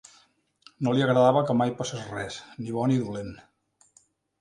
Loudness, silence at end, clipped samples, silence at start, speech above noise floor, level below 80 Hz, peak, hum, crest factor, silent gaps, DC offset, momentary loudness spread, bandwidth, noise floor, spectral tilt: -26 LUFS; 1.05 s; under 0.1%; 0.8 s; 39 dB; -62 dBFS; -6 dBFS; none; 22 dB; none; under 0.1%; 16 LU; 11 kHz; -64 dBFS; -6.5 dB/octave